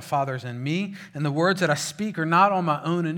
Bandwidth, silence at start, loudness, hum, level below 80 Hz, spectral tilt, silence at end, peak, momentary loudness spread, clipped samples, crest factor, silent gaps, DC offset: 17.5 kHz; 0 s; -24 LUFS; none; -74 dBFS; -5.5 dB/octave; 0 s; -6 dBFS; 10 LU; under 0.1%; 18 dB; none; under 0.1%